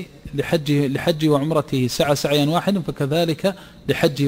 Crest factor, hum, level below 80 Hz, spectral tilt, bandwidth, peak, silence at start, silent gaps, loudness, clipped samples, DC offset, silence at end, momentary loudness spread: 16 dB; none; -48 dBFS; -6 dB/octave; 16 kHz; -4 dBFS; 0 s; none; -20 LUFS; under 0.1%; under 0.1%; 0 s; 7 LU